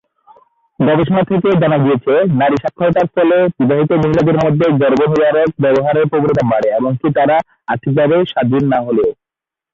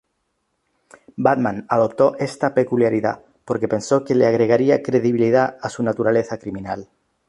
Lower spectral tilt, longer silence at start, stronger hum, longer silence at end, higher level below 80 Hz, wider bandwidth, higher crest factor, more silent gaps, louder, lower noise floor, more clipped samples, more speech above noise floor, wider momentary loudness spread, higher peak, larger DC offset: first, -9 dB/octave vs -7 dB/octave; second, 0.8 s vs 1.2 s; neither; first, 0.6 s vs 0.45 s; first, -46 dBFS vs -58 dBFS; second, 7.4 kHz vs 11.5 kHz; second, 10 dB vs 16 dB; neither; first, -13 LUFS vs -19 LUFS; first, -86 dBFS vs -72 dBFS; neither; first, 73 dB vs 53 dB; second, 4 LU vs 12 LU; about the same, -2 dBFS vs -2 dBFS; neither